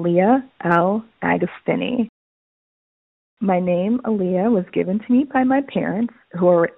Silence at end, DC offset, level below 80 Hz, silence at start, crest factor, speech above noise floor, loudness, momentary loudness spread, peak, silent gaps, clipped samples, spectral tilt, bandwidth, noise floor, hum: 0.05 s; under 0.1%; -58 dBFS; 0 s; 18 dB; over 71 dB; -20 LUFS; 6 LU; -2 dBFS; 2.09-3.37 s; under 0.1%; -6.5 dB/octave; 4 kHz; under -90 dBFS; none